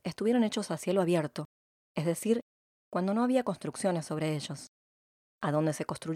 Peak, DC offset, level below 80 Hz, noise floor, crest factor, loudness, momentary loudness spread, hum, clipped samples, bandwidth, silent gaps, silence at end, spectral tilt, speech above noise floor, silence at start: -16 dBFS; under 0.1%; -74 dBFS; under -90 dBFS; 16 dB; -31 LUFS; 13 LU; none; under 0.1%; 15.5 kHz; 1.45-1.95 s, 2.42-2.91 s, 4.68-5.39 s; 0 s; -6 dB/octave; over 60 dB; 0.05 s